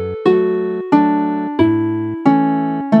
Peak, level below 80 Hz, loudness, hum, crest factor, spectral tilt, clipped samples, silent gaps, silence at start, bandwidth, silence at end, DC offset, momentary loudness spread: 0 dBFS; -54 dBFS; -16 LUFS; none; 14 dB; -9 dB/octave; under 0.1%; none; 0 s; 5.6 kHz; 0 s; under 0.1%; 5 LU